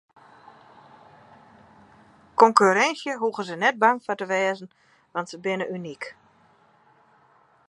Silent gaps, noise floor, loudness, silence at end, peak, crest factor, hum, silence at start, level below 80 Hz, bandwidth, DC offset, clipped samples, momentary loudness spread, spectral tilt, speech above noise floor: none; -59 dBFS; -23 LUFS; 1.55 s; -2 dBFS; 26 dB; none; 2.4 s; -74 dBFS; 11 kHz; under 0.1%; under 0.1%; 17 LU; -4 dB/octave; 37 dB